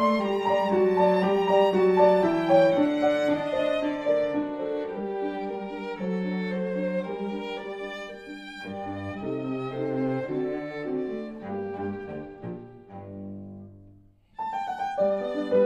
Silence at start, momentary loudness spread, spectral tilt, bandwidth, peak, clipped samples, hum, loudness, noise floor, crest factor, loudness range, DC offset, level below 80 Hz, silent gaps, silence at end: 0 s; 18 LU; -7.5 dB/octave; 9.4 kHz; -8 dBFS; under 0.1%; none; -26 LUFS; -55 dBFS; 18 dB; 13 LU; under 0.1%; -60 dBFS; none; 0 s